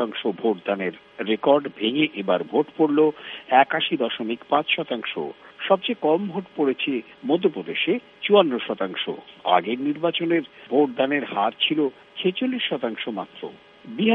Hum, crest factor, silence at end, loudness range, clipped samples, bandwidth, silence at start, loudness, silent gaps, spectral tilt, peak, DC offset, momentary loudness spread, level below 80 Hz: none; 22 dB; 0 s; 3 LU; under 0.1%; 4.5 kHz; 0 s; -23 LUFS; none; -8 dB/octave; -2 dBFS; under 0.1%; 11 LU; -72 dBFS